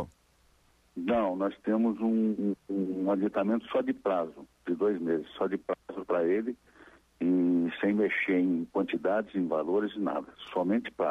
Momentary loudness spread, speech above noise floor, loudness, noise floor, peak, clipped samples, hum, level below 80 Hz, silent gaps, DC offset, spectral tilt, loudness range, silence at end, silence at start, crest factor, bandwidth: 9 LU; 37 dB; -30 LUFS; -66 dBFS; -18 dBFS; under 0.1%; none; -66 dBFS; none; under 0.1%; -8 dB/octave; 2 LU; 0 s; 0 s; 12 dB; 6.2 kHz